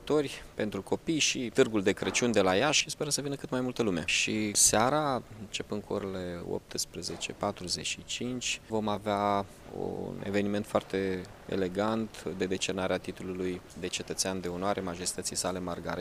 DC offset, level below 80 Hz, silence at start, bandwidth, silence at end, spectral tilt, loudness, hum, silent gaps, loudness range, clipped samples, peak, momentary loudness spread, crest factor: under 0.1%; -58 dBFS; 0 s; 15.5 kHz; 0 s; -3 dB/octave; -31 LUFS; none; none; 7 LU; under 0.1%; -10 dBFS; 11 LU; 20 dB